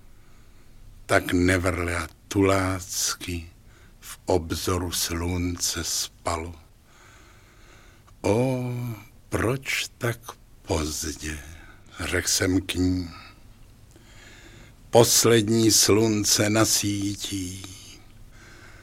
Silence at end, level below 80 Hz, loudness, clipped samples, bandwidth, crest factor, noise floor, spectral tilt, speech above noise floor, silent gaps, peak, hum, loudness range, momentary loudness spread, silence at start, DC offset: 0 s; -46 dBFS; -23 LUFS; under 0.1%; 16.5 kHz; 24 dB; -52 dBFS; -3.5 dB/octave; 28 dB; none; -2 dBFS; none; 9 LU; 18 LU; 0.8 s; under 0.1%